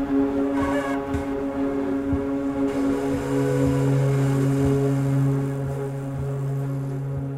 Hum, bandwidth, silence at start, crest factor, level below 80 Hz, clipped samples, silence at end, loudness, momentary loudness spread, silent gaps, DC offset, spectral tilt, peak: none; 13 kHz; 0 s; 14 dB; -42 dBFS; under 0.1%; 0 s; -24 LUFS; 7 LU; none; under 0.1%; -8 dB/octave; -10 dBFS